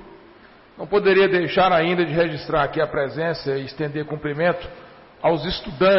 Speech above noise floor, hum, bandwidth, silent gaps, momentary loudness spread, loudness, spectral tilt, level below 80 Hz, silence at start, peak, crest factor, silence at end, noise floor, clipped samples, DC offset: 28 dB; none; 5.8 kHz; none; 10 LU; -21 LUFS; -10 dB/octave; -46 dBFS; 0 s; -8 dBFS; 12 dB; 0 s; -48 dBFS; under 0.1%; under 0.1%